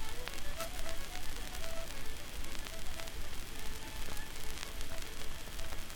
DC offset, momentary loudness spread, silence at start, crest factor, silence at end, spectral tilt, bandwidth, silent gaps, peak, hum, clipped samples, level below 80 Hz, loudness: under 0.1%; 3 LU; 0 s; 18 dB; 0 s; -2.5 dB/octave; 19 kHz; none; -16 dBFS; none; under 0.1%; -42 dBFS; -44 LUFS